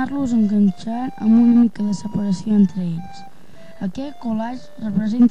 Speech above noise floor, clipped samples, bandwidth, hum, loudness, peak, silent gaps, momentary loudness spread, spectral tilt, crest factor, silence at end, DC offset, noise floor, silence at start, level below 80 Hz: 27 dB; under 0.1%; 8.6 kHz; none; -19 LUFS; -6 dBFS; none; 15 LU; -8 dB/octave; 12 dB; 0 s; 2%; -45 dBFS; 0 s; -52 dBFS